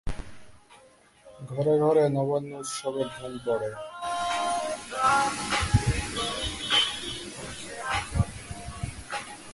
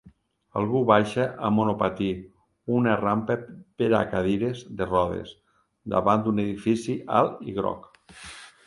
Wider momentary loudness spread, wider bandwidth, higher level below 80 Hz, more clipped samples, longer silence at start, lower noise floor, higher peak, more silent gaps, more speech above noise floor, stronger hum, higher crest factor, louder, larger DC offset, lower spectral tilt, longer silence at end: second, 15 LU vs 18 LU; about the same, 11.5 kHz vs 11.5 kHz; first, -42 dBFS vs -54 dBFS; neither; about the same, 0.05 s vs 0.05 s; about the same, -57 dBFS vs -57 dBFS; second, -8 dBFS vs -4 dBFS; neither; about the same, 30 dB vs 32 dB; neither; about the same, 20 dB vs 22 dB; second, -28 LUFS vs -25 LUFS; neither; second, -4 dB/octave vs -7 dB/octave; second, 0 s vs 0.15 s